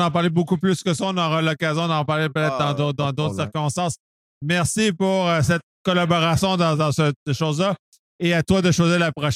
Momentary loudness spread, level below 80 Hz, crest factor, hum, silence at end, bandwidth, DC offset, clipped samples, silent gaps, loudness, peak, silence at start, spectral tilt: 6 LU; -50 dBFS; 16 dB; none; 0 s; 14.5 kHz; under 0.1%; under 0.1%; 4.00-4.41 s, 5.63-5.85 s, 7.16-7.26 s, 7.79-7.92 s, 7.99-8.19 s; -21 LUFS; -6 dBFS; 0 s; -5.5 dB/octave